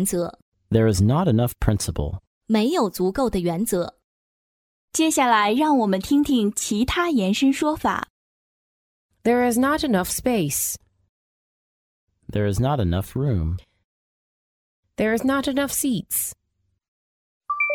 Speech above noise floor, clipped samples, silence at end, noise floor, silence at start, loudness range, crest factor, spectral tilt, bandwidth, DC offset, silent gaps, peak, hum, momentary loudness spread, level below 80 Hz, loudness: over 69 dB; under 0.1%; 0 s; under -90 dBFS; 0 s; 6 LU; 20 dB; -5 dB/octave; 18 kHz; under 0.1%; 0.42-0.52 s, 2.27-2.41 s, 4.04-4.88 s, 8.10-9.09 s, 11.09-12.07 s, 13.84-14.83 s, 16.88-17.41 s; -4 dBFS; none; 10 LU; -42 dBFS; -22 LUFS